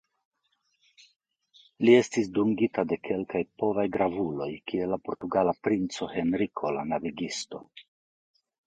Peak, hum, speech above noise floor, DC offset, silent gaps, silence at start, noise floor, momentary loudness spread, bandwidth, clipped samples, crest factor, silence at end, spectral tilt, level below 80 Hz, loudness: -6 dBFS; none; 48 dB; under 0.1%; none; 1.8 s; -75 dBFS; 11 LU; 9.4 kHz; under 0.1%; 22 dB; 0.85 s; -5.5 dB/octave; -62 dBFS; -28 LUFS